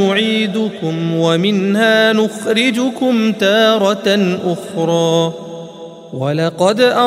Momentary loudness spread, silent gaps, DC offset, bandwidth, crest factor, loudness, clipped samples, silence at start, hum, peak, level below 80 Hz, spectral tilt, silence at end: 10 LU; none; under 0.1%; 15 kHz; 14 dB; -14 LUFS; under 0.1%; 0 s; none; 0 dBFS; -62 dBFS; -5 dB/octave; 0 s